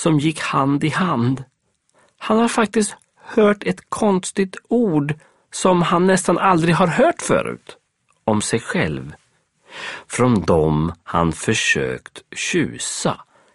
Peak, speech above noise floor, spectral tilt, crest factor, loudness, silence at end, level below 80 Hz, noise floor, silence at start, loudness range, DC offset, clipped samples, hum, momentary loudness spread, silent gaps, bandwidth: 0 dBFS; 44 dB; -5 dB/octave; 18 dB; -19 LUFS; 0.35 s; -46 dBFS; -62 dBFS; 0 s; 3 LU; under 0.1%; under 0.1%; none; 15 LU; none; 11.5 kHz